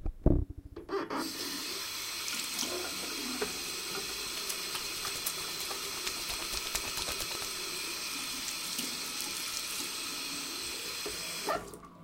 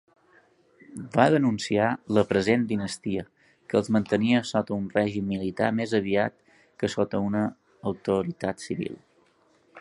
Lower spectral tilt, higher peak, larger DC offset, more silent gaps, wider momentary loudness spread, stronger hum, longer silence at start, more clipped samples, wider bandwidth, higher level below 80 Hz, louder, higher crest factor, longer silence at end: second, -2 dB/octave vs -6 dB/octave; second, -8 dBFS vs -2 dBFS; neither; neither; second, 3 LU vs 10 LU; neither; second, 0 s vs 0.9 s; neither; first, 17 kHz vs 11.5 kHz; first, -46 dBFS vs -58 dBFS; second, -34 LUFS vs -26 LUFS; about the same, 28 dB vs 24 dB; about the same, 0 s vs 0 s